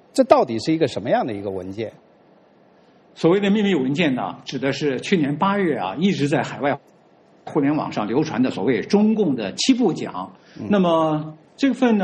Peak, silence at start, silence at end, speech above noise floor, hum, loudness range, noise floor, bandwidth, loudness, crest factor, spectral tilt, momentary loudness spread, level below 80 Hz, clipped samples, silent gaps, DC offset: 0 dBFS; 0.15 s; 0 s; 33 dB; none; 3 LU; -53 dBFS; 10 kHz; -21 LUFS; 20 dB; -6 dB/octave; 12 LU; -62 dBFS; under 0.1%; none; under 0.1%